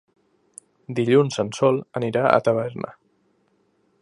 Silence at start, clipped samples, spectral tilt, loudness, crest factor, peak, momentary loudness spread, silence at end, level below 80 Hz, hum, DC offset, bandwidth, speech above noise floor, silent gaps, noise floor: 0.9 s; under 0.1%; -6.5 dB/octave; -21 LUFS; 22 dB; 0 dBFS; 15 LU; 1.1 s; -64 dBFS; none; under 0.1%; 11.5 kHz; 45 dB; none; -65 dBFS